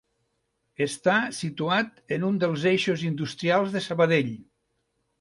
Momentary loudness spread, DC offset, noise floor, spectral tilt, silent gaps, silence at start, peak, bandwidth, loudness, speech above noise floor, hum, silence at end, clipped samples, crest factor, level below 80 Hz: 8 LU; under 0.1%; -75 dBFS; -5.5 dB/octave; none; 0.8 s; -8 dBFS; 11.5 kHz; -25 LUFS; 50 dB; none; 0.8 s; under 0.1%; 18 dB; -68 dBFS